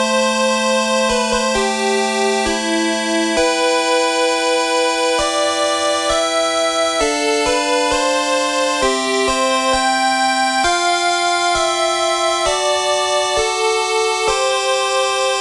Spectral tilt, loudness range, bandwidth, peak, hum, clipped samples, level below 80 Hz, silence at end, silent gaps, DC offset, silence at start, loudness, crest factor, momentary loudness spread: -1.5 dB/octave; 1 LU; 13.5 kHz; -4 dBFS; none; under 0.1%; -42 dBFS; 0 s; none; under 0.1%; 0 s; -16 LUFS; 14 dB; 1 LU